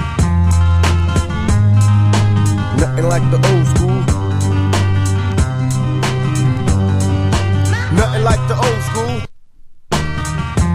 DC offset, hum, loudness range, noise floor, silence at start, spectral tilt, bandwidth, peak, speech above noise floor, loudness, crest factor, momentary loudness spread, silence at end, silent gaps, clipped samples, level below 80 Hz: under 0.1%; none; 3 LU; -36 dBFS; 0 s; -6 dB/octave; 13 kHz; 0 dBFS; 22 dB; -15 LUFS; 14 dB; 6 LU; 0 s; none; under 0.1%; -24 dBFS